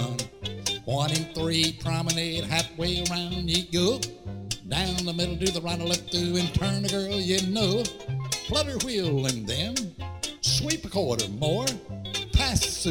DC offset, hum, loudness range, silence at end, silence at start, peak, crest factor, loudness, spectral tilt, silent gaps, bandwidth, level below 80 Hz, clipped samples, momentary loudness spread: under 0.1%; none; 1 LU; 0 s; 0 s; -8 dBFS; 20 dB; -27 LUFS; -4 dB/octave; none; 17 kHz; -40 dBFS; under 0.1%; 7 LU